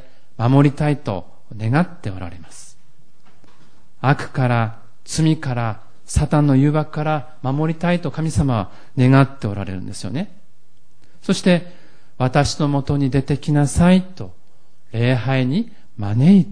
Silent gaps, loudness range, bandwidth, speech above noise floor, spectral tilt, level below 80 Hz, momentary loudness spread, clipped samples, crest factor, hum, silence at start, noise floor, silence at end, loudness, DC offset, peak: none; 6 LU; 10.5 kHz; 43 dB; -7 dB/octave; -38 dBFS; 15 LU; under 0.1%; 16 dB; none; 0.4 s; -61 dBFS; 0 s; -19 LUFS; 3%; -2 dBFS